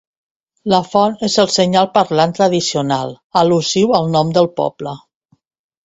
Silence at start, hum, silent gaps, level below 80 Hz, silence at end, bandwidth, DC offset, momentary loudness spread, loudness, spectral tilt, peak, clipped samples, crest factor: 0.65 s; none; 3.24-3.30 s; -56 dBFS; 0.85 s; 8.2 kHz; under 0.1%; 8 LU; -15 LUFS; -5 dB/octave; 0 dBFS; under 0.1%; 16 dB